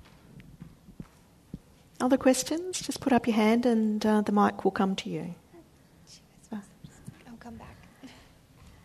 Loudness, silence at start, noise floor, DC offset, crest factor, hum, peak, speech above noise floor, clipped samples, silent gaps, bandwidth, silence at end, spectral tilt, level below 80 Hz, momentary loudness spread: -26 LUFS; 0.35 s; -57 dBFS; under 0.1%; 20 dB; none; -10 dBFS; 31 dB; under 0.1%; none; 13.5 kHz; 0.75 s; -5 dB/octave; -60 dBFS; 25 LU